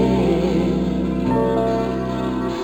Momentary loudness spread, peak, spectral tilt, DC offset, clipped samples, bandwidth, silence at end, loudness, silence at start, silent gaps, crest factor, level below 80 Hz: 5 LU; -6 dBFS; -8 dB/octave; 0.2%; under 0.1%; 15 kHz; 0 s; -20 LUFS; 0 s; none; 12 dB; -34 dBFS